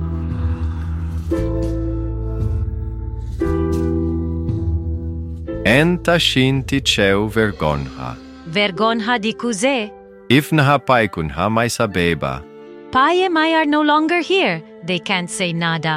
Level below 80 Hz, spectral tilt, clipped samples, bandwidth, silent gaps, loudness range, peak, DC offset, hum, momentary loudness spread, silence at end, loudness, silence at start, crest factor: -30 dBFS; -5 dB/octave; under 0.1%; 16 kHz; none; 5 LU; 0 dBFS; under 0.1%; none; 12 LU; 0 s; -18 LUFS; 0 s; 18 dB